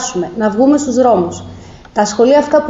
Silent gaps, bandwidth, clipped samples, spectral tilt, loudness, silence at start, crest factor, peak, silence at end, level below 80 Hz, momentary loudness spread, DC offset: none; 8 kHz; under 0.1%; -5 dB/octave; -13 LUFS; 0 s; 12 dB; 0 dBFS; 0 s; -46 dBFS; 12 LU; under 0.1%